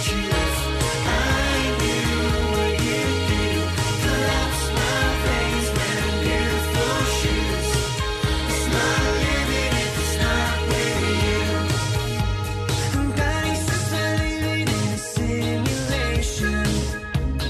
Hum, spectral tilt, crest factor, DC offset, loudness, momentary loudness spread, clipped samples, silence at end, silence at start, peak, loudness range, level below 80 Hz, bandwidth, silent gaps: none; -4.5 dB/octave; 12 dB; under 0.1%; -22 LUFS; 3 LU; under 0.1%; 0 s; 0 s; -10 dBFS; 2 LU; -28 dBFS; 13.5 kHz; none